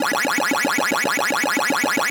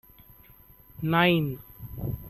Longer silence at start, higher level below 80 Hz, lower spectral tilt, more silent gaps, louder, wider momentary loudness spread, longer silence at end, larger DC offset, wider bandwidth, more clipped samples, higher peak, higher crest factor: second, 0 s vs 1 s; second, -68 dBFS vs -50 dBFS; second, -1.5 dB/octave vs -8 dB/octave; neither; first, -19 LUFS vs -26 LUFS; second, 0 LU vs 19 LU; about the same, 0 s vs 0 s; neither; first, over 20 kHz vs 13.5 kHz; neither; about the same, -10 dBFS vs -8 dBFS; second, 10 dB vs 22 dB